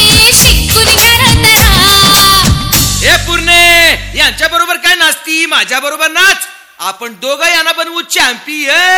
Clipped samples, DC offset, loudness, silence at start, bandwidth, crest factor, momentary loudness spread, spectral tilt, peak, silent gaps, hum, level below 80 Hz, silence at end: 2%; under 0.1%; -6 LUFS; 0 s; over 20 kHz; 8 dB; 11 LU; -2 dB/octave; 0 dBFS; none; none; -22 dBFS; 0 s